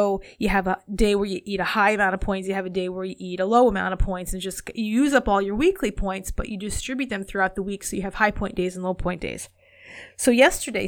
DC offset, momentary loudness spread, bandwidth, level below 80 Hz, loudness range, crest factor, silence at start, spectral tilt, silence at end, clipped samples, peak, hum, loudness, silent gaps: under 0.1%; 12 LU; 18.5 kHz; -36 dBFS; 4 LU; 20 dB; 0 s; -4.5 dB/octave; 0 s; under 0.1%; -4 dBFS; none; -23 LUFS; none